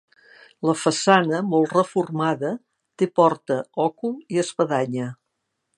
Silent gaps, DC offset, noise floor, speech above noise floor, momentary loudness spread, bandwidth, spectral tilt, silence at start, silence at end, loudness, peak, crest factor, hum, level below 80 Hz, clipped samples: none; under 0.1%; -77 dBFS; 56 dB; 10 LU; 11.5 kHz; -5 dB/octave; 0.6 s; 0.65 s; -22 LUFS; 0 dBFS; 22 dB; none; -74 dBFS; under 0.1%